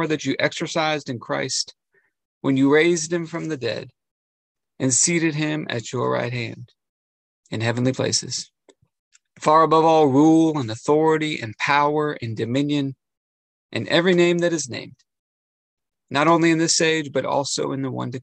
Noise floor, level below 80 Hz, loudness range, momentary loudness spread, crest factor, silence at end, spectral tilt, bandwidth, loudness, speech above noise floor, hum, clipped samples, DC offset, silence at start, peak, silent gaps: under -90 dBFS; -66 dBFS; 6 LU; 13 LU; 18 dB; 0 s; -4 dB/octave; 9.8 kHz; -20 LUFS; over 70 dB; none; under 0.1%; under 0.1%; 0 s; -4 dBFS; 2.25-2.41 s, 4.11-4.55 s, 6.89-7.43 s, 8.99-9.11 s, 13.17-13.69 s, 15.19-15.77 s